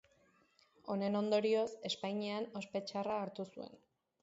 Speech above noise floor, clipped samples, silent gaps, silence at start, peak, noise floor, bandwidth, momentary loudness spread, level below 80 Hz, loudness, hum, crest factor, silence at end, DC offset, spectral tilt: 34 dB; under 0.1%; none; 0.85 s; -22 dBFS; -72 dBFS; 7.6 kHz; 14 LU; -82 dBFS; -38 LUFS; none; 18 dB; 0.45 s; under 0.1%; -4 dB/octave